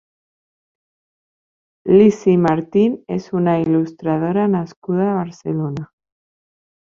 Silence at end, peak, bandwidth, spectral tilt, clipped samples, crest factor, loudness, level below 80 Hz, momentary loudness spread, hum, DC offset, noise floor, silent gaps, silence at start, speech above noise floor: 1 s; -2 dBFS; 7.4 kHz; -8.5 dB/octave; under 0.1%; 18 dB; -17 LUFS; -58 dBFS; 12 LU; none; under 0.1%; under -90 dBFS; 4.76-4.82 s; 1.85 s; over 74 dB